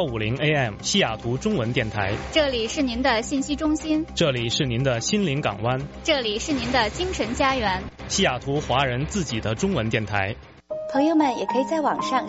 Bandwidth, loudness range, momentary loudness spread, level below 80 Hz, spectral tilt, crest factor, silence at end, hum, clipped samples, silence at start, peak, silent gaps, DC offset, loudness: 8 kHz; 1 LU; 5 LU; -42 dBFS; -4 dB/octave; 16 dB; 0 s; none; under 0.1%; 0 s; -8 dBFS; none; under 0.1%; -23 LUFS